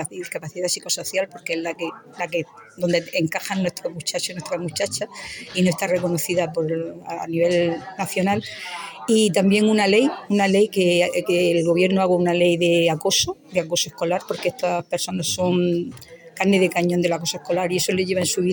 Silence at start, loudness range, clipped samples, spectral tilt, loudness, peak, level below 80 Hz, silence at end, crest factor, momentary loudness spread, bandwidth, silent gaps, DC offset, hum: 0 s; 7 LU; under 0.1%; -4.5 dB/octave; -21 LUFS; -4 dBFS; -60 dBFS; 0 s; 16 dB; 10 LU; over 20 kHz; none; under 0.1%; none